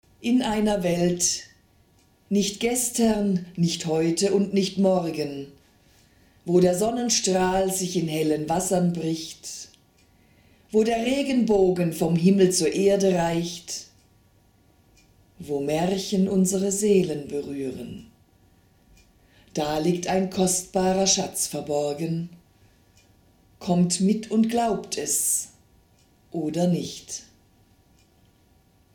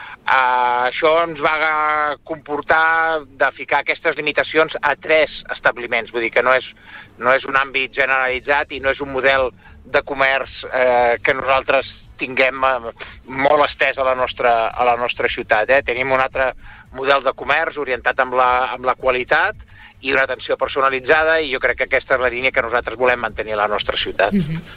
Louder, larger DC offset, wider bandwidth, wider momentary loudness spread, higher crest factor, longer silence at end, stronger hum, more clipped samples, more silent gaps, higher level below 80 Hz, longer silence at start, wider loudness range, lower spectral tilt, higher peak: second, -23 LUFS vs -17 LUFS; neither; first, 17.5 kHz vs 6.8 kHz; first, 14 LU vs 6 LU; about the same, 18 dB vs 16 dB; first, 1.75 s vs 0 s; neither; neither; neither; second, -54 dBFS vs -44 dBFS; first, 0.2 s vs 0 s; first, 6 LU vs 1 LU; second, -4.5 dB/octave vs -6 dB/octave; second, -6 dBFS vs -2 dBFS